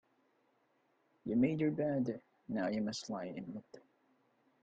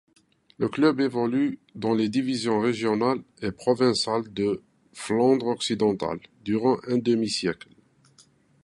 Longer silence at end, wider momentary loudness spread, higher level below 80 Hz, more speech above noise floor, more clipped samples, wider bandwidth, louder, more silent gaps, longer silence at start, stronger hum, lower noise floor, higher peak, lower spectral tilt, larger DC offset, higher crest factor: second, 0.85 s vs 1.1 s; first, 15 LU vs 9 LU; second, -76 dBFS vs -62 dBFS; first, 40 dB vs 35 dB; neither; second, 9 kHz vs 11.5 kHz; second, -37 LUFS vs -25 LUFS; neither; first, 1.25 s vs 0.6 s; neither; first, -76 dBFS vs -59 dBFS; second, -20 dBFS vs -8 dBFS; about the same, -6.5 dB/octave vs -5.5 dB/octave; neither; about the same, 18 dB vs 18 dB